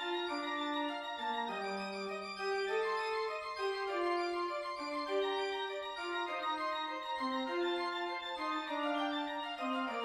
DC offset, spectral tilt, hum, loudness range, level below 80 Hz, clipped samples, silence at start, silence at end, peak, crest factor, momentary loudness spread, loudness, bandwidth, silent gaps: under 0.1%; -3.5 dB/octave; none; 1 LU; -76 dBFS; under 0.1%; 0 s; 0 s; -24 dBFS; 14 dB; 4 LU; -37 LUFS; 13.5 kHz; none